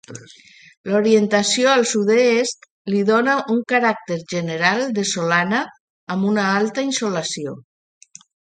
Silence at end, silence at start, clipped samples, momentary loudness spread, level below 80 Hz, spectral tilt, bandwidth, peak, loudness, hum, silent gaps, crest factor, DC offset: 0.95 s; 0.1 s; under 0.1%; 13 LU; -68 dBFS; -4 dB/octave; 9.6 kHz; -2 dBFS; -18 LUFS; none; 0.77-0.84 s, 2.70-2.85 s, 5.80-6.07 s; 18 dB; under 0.1%